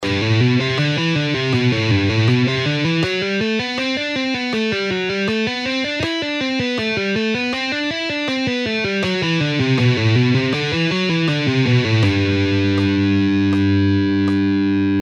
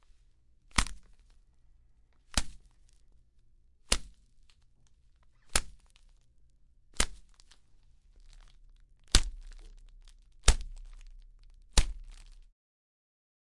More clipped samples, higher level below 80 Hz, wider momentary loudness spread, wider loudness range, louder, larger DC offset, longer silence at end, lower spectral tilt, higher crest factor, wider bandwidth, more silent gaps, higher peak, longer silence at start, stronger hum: neither; second, -50 dBFS vs -38 dBFS; second, 4 LU vs 26 LU; about the same, 3 LU vs 5 LU; first, -18 LUFS vs -32 LUFS; neither; second, 0 s vs 1.25 s; first, -6 dB/octave vs -2 dB/octave; second, 14 dB vs 32 dB; second, 9.2 kHz vs 11.5 kHz; neither; about the same, -4 dBFS vs -2 dBFS; second, 0 s vs 0.75 s; neither